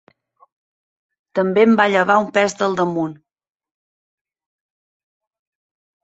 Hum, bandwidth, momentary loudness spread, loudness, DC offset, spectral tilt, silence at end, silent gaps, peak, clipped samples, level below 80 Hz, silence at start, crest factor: none; 8.2 kHz; 11 LU; -17 LUFS; under 0.1%; -5.5 dB/octave; 2.9 s; none; -2 dBFS; under 0.1%; -66 dBFS; 1.35 s; 20 dB